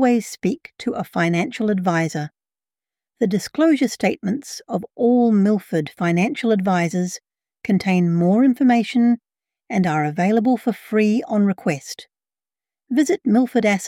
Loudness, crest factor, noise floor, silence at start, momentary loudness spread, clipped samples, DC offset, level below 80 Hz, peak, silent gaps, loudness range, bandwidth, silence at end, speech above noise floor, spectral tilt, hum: -20 LUFS; 14 dB; under -90 dBFS; 0 s; 11 LU; under 0.1%; under 0.1%; -64 dBFS; -6 dBFS; none; 4 LU; 15.5 kHz; 0 s; over 71 dB; -6.5 dB/octave; none